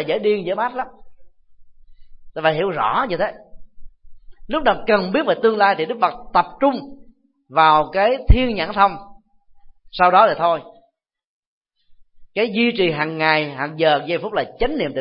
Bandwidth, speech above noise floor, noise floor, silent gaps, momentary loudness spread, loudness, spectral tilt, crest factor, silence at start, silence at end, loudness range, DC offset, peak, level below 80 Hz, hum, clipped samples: 5.6 kHz; 46 dB; -64 dBFS; 11.27-11.61 s; 11 LU; -18 LUFS; -10.5 dB/octave; 20 dB; 0 s; 0 s; 6 LU; under 0.1%; 0 dBFS; -32 dBFS; none; under 0.1%